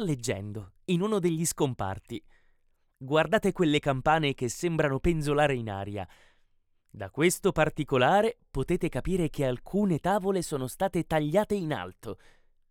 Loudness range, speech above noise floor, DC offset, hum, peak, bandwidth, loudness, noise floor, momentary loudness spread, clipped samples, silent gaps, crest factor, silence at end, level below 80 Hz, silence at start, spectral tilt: 3 LU; 40 dB; under 0.1%; none; -10 dBFS; 17.5 kHz; -28 LUFS; -68 dBFS; 14 LU; under 0.1%; none; 18 dB; 0.55 s; -46 dBFS; 0 s; -5.5 dB/octave